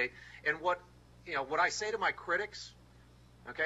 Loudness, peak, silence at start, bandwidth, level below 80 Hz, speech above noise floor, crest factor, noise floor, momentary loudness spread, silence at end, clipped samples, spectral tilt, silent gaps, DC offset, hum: -34 LUFS; -18 dBFS; 0 s; 12.5 kHz; -64 dBFS; 24 dB; 18 dB; -59 dBFS; 17 LU; 0 s; under 0.1%; -2.5 dB/octave; none; under 0.1%; none